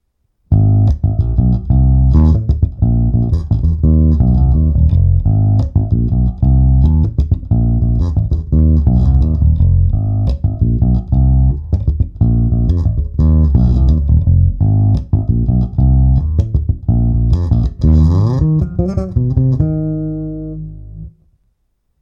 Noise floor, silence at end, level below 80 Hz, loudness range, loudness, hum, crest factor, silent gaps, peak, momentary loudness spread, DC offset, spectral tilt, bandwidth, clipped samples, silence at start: -63 dBFS; 0.9 s; -16 dBFS; 2 LU; -13 LUFS; 50 Hz at -40 dBFS; 10 dB; none; 0 dBFS; 6 LU; under 0.1%; -11.5 dB/octave; 5.2 kHz; under 0.1%; 0.5 s